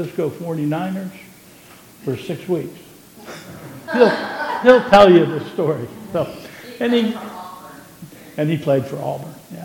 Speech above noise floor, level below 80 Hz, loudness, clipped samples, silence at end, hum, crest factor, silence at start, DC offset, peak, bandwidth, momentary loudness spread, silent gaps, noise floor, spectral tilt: 27 dB; -54 dBFS; -18 LUFS; under 0.1%; 0 s; none; 18 dB; 0 s; under 0.1%; 0 dBFS; 17.5 kHz; 24 LU; none; -44 dBFS; -6.5 dB/octave